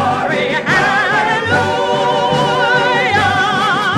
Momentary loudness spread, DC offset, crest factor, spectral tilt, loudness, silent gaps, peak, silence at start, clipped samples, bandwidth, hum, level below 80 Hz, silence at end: 3 LU; under 0.1%; 12 dB; -4.5 dB/octave; -13 LUFS; none; 0 dBFS; 0 s; under 0.1%; 13.5 kHz; none; -46 dBFS; 0 s